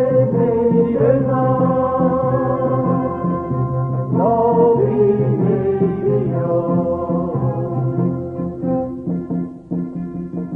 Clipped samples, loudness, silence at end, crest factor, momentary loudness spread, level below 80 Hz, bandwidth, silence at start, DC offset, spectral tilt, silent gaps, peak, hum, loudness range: under 0.1%; -18 LUFS; 0 s; 14 dB; 10 LU; -44 dBFS; 3.3 kHz; 0 s; under 0.1%; -12.5 dB/octave; none; -2 dBFS; none; 5 LU